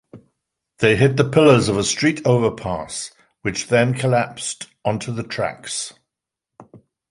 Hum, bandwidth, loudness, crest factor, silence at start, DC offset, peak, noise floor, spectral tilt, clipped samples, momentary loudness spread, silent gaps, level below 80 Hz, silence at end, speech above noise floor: none; 11.5 kHz; -19 LUFS; 18 dB; 0.15 s; under 0.1%; -2 dBFS; -84 dBFS; -5 dB/octave; under 0.1%; 13 LU; none; -50 dBFS; 0.35 s; 65 dB